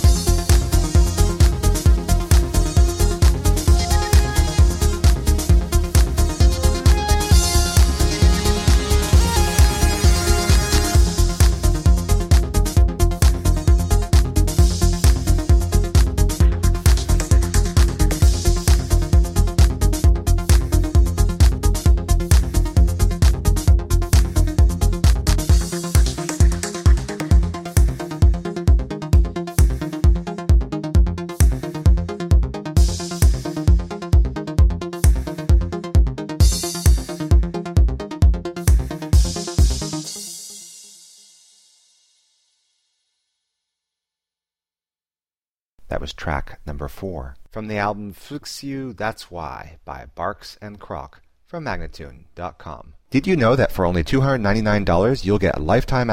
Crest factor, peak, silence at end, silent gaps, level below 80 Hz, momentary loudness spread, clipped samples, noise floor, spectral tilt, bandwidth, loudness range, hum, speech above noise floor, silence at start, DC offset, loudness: 14 dB; -2 dBFS; 0 s; 45.61-45.76 s; -18 dBFS; 12 LU; under 0.1%; under -90 dBFS; -5.5 dB/octave; 16 kHz; 12 LU; none; over 69 dB; 0 s; under 0.1%; -18 LUFS